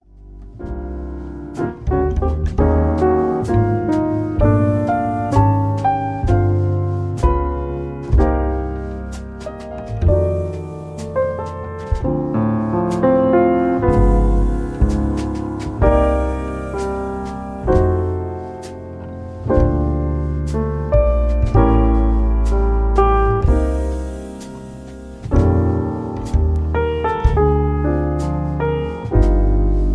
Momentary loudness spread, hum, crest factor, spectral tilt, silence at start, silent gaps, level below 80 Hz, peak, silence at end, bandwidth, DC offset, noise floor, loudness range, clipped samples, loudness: 14 LU; none; 16 dB; -9 dB/octave; 0.15 s; none; -20 dBFS; -2 dBFS; 0 s; 10 kHz; under 0.1%; -37 dBFS; 4 LU; under 0.1%; -18 LUFS